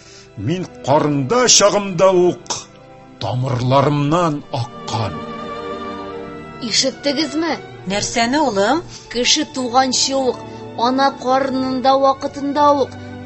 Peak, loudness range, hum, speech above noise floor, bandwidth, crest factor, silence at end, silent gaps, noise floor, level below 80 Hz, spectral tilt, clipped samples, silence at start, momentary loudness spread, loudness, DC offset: 0 dBFS; 6 LU; none; 24 dB; 16 kHz; 18 dB; 0 s; none; -41 dBFS; -48 dBFS; -3.5 dB/octave; under 0.1%; 0.05 s; 13 LU; -17 LUFS; under 0.1%